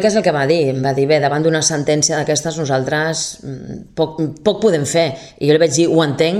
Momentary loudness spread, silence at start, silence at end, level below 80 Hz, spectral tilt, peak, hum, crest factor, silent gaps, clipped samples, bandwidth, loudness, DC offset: 8 LU; 0 s; 0 s; -52 dBFS; -4.5 dB/octave; 0 dBFS; none; 16 dB; none; under 0.1%; 15 kHz; -16 LUFS; under 0.1%